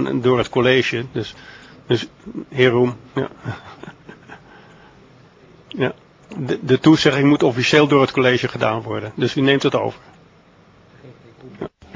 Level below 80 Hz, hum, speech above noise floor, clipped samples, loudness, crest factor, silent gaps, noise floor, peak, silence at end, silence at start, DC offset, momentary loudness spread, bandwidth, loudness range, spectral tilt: -52 dBFS; none; 32 dB; under 0.1%; -18 LUFS; 20 dB; none; -50 dBFS; 0 dBFS; 0.25 s; 0 s; under 0.1%; 20 LU; 7.6 kHz; 13 LU; -6 dB/octave